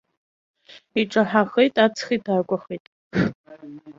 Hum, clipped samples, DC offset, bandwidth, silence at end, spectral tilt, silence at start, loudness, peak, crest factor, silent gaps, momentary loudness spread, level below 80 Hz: none; under 0.1%; under 0.1%; 7.6 kHz; 0.05 s; -6 dB/octave; 0.95 s; -22 LUFS; -2 dBFS; 20 dB; 2.80-3.11 s, 3.35-3.44 s; 18 LU; -58 dBFS